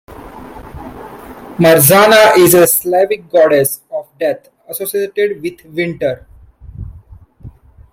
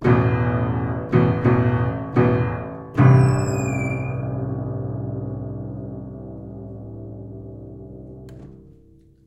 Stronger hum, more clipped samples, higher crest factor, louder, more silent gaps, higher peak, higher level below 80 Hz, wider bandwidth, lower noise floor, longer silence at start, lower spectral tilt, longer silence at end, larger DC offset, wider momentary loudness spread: neither; neither; second, 14 dB vs 20 dB; first, -11 LUFS vs -21 LUFS; neither; about the same, 0 dBFS vs -2 dBFS; about the same, -42 dBFS vs -40 dBFS; first, 17 kHz vs 8.4 kHz; second, -39 dBFS vs -51 dBFS; about the same, 0.1 s vs 0 s; second, -4 dB/octave vs -8.5 dB/octave; second, 0.45 s vs 0.6 s; neither; first, 26 LU vs 20 LU